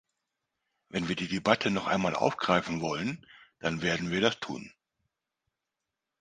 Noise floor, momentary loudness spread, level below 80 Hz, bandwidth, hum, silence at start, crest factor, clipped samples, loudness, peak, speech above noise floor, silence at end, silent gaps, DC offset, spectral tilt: -87 dBFS; 11 LU; -62 dBFS; 9.6 kHz; none; 0.95 s; 26 dB; under 0.1%; -30 LUFS; -6 dBFS; 58 dB; 1.5 s; none; under 0.1%; -5 dB/octave